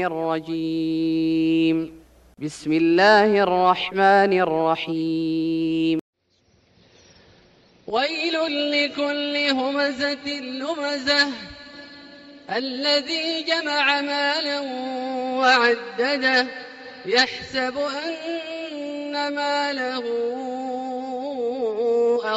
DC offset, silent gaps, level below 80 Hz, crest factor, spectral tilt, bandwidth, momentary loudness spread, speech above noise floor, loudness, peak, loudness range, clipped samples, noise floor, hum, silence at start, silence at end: under 0.1%; 6.01-6.13 s; -62 dBFS; 18 dB; -4.5 dB/octave; 9.4 kHz; 12 LU; 41 dB; -22 LUFS; -4 dBFS; 7 LU; under 0.1%; -63 dBFS; none; 0 s; 0 s